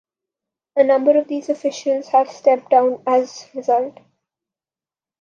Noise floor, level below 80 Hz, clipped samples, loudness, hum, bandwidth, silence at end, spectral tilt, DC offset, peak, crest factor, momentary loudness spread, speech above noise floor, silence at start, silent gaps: under -90 dBFS; -78 dBFS; under 0.1%; -18 LUFS; none; 7.4 kHz; 1.3 s; -4 dB/octave; under 0.1%; -2 dBFS; 16 dB; 10 LU; over 73 dB; 0.75 s; none